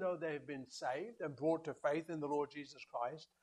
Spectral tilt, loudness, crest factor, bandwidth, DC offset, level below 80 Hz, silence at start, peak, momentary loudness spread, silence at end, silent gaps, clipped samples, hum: -5.5 dB/octave; -42 LUFS; 18 dB; 11.5 kHz; under 0.1%; -84 dBFS; 0 s; -24 dBFS; 7 LU; 0.15 s; none; under 0.1%; none